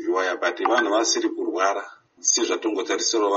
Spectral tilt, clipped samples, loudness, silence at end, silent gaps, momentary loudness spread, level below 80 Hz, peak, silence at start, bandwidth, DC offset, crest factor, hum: 1.5 dB/octave; under 0.1%; -22 LUFS; 0 s; none; 5 LU; -76 dBFS; -8 dBFS; 0 s; 8 kHz; under 0.1%; 16 dB; none